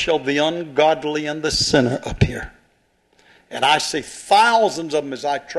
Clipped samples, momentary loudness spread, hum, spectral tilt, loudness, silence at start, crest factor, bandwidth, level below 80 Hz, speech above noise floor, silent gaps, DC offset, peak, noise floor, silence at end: under 0.1%; 9 LU; none; -4 dB/octave; -19 LUFS; 0 s; 18 dB; 12.5 kHz; -42 dBFS; 43 dB; none; under 0.1%; 0 dBFS; -62 dBFS; 0 s